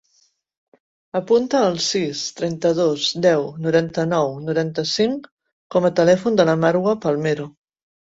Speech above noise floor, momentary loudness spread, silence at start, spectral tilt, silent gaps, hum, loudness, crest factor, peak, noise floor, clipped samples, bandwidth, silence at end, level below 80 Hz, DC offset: 44 dB; 8 LU; 1.15 s; -5 dB/octave; 5.31-5.37 s, 5.52-5.70 s; none; -19 LUFS; 18 dB; -2 dBFS; -63 dBFS; under 0.1%; 8 kHz; 0.6 s; -60 dBFS; under 0.1%